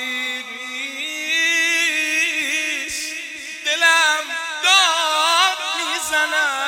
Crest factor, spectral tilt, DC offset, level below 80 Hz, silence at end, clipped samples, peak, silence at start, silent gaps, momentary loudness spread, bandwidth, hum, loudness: 18 dB; 2.5 dB/octave; under 0.1%; -64 dBFS; 0 s; under 0.1%; -2 dBFS; 0 s; none; 12 LU; 17.5 kHz; none; -17 LUFS